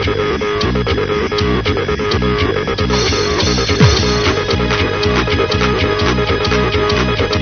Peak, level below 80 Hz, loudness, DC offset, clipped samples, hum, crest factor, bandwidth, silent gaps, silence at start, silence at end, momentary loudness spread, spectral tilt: 0 dBFS; -24 dBFS; -14 LUFS; under 0.1%; under 0.1%; none; 14 dB; 6.6 kHz; none; 0 s; 0 s; 4 LU; -5 dB/octave